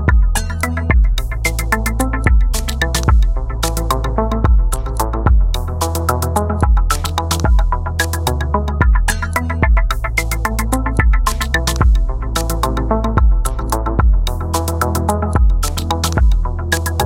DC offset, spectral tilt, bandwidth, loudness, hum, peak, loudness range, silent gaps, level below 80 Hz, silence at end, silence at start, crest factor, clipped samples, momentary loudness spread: under 0.1%; -5 dB/octave; 17 kHz; -17 LUFS; none; 0 dBFS; 1 LU; none; -16 dBFS; 0 s; 0 s; 14 dB; under 0.1%; 4 LU